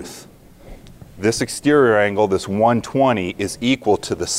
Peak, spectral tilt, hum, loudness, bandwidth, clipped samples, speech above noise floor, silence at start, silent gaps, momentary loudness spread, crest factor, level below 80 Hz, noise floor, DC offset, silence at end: -4 dBFS; -4.5 dB/octave; none; -18 LUFS; 16 kHz; under 0.1%; 23 dB; 0 s; none; 8 LU; 16 dB; -48 dBFS; -41 dBFS; under 0.1%; 0 s